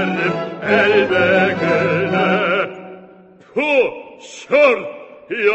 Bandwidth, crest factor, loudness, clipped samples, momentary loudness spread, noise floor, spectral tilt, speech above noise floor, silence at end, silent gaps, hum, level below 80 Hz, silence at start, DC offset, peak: 8.4 kHz; 16 dB; -16 LUFS; under 0.1%; 19 LU; -44 dBFS; -6 dB/octave; 29 dB; 0 s; none; none; -56 dBFS; 0 s; under 0.1%; -2 dBFS